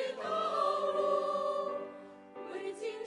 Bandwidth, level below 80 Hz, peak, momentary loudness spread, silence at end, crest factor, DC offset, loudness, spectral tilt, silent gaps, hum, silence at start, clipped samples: 11 kHz; -84 dBFS; -18 dBFS; 16 LU; 0 s; 16 dB; under 0.1%; -34 LUFS; -4 dB/octave; none; none; 0 s; under 0.1%